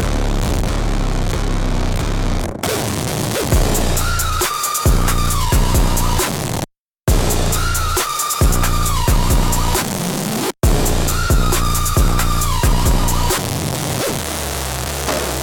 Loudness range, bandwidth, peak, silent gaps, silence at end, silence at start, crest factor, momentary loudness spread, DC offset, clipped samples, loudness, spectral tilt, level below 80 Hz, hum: 2 LU; 19 kHz; -2 dBFS; 6.79-6.91 s; 0 s; 0 s; 14 dB; 5 LU; under 0.1%; under 0.1%; -18 LUFS; -4 dB/octave; -18 dBFS; none